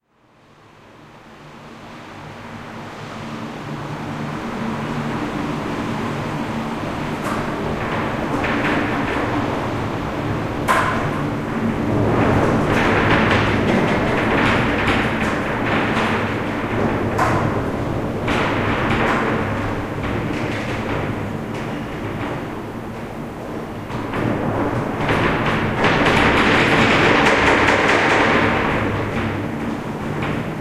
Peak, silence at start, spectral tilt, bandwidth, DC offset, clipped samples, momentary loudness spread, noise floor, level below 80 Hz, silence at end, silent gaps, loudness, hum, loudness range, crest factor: -2 dBFS; 0.85 s; -6 dB/octave; 15.5 kHz; under 0.1%; under 0.1%; 15 LU; -54 dBFS; -36 dBFS; 0 s; none; -19 LUFS; none; 12 LU; 18 dB